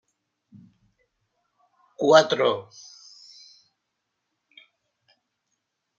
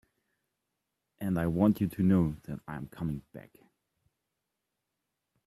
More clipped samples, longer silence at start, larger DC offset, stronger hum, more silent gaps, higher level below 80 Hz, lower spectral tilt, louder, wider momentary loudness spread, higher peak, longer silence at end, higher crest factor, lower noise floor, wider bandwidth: neither; first, 2 s vs 1.2 s; neither; neither; neither; second, -78 dBFS vs -58 dBFS; second, -3.5 dB/octave vs -9 dB/octave; first, -20 LUFS vs -30 LUFS; first, 29 LU vs 16 LU; first, -2 dBFS vs -12 dBFS; first, 3.4 s vs 2.05 s; about the same, 26 dB vs 22 dB; second, -80 dBFS vs -85 dBFS; second, 7.6 kHz vs 13.5 kHz